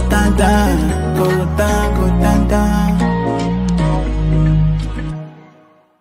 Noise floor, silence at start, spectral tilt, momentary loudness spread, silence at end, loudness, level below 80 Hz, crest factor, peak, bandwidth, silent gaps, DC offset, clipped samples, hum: -48 dBFS; 0 s; -6.5 dB/octave; 7 LU; 0.6 s; -15 LUFS; -20 dBFS; 14 dB; 0 dBFS; 16 kHz; none; under 0.1%; under 0.1%; none